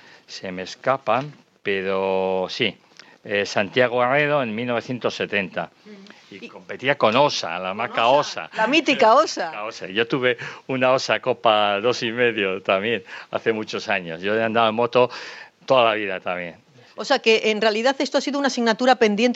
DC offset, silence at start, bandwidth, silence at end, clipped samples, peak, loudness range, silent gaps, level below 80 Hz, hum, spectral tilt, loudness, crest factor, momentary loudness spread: under 0.1%; 0.3 s; 8.2 kHz; 0 s; under 0.1%; -2 dBFS; 4 LU; none; -72 dBFS; none; -4 dB/octave; -21 LUFS; 20 dB; 14 LU